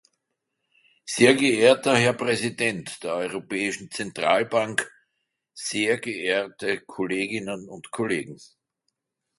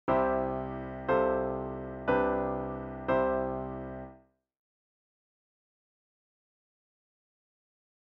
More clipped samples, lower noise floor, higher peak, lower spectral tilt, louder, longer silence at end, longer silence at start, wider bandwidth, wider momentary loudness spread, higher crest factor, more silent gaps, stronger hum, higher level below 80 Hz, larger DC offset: neither; first, -80 dBFS vs -58 dBFS; first, -2 dBFS vs -16 dBFS; second, -4 dB/octave vs -6 dB/octave; first, -24 LUFS vs -31 LUFS; second, 0.95 s vs 3.85 s; first, 1.05 s vs 0.05 s; first, 11.5 kHz vs 5.4 kHz; first, 15 LU vs 11 LU; first, 24 dB vs 18 dB; neither; neither; second, -68 dBFS vs -52 dBFS; neither